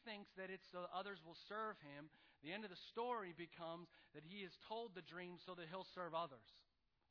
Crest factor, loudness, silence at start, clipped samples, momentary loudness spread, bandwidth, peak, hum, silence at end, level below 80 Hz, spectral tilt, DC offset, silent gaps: 18 dB; -52 LUFS; 0 s; under 0.1%; 11 LU; 5.4 kHz; -34 dBFS; none; 0.5 s; -88 dBFS; -2.5 dB/octave; under 0.1%; none